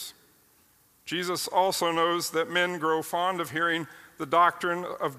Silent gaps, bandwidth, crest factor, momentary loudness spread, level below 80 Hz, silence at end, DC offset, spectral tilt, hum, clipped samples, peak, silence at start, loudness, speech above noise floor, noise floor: none; 15.5 kHz; 18 dB; 11 LU; -74 dBFS; 0 s; under 0.1%; -3 dB/octave; none; under 0.1%; -10 dBFS; 0 s; -27 LUFS; 36 dB; -63 dBFS